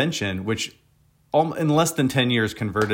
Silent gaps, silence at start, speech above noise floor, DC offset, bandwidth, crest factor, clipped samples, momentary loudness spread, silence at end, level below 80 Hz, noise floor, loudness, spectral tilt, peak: none; 0 s; 29 dB; under 0.1%; 16.5 kHz; 16 dB; under 0.1%; 7 LU; 0 s; -56 dBFS; -51 dBFS; -22 LUFS; -5 dB/octave; -8 dBFS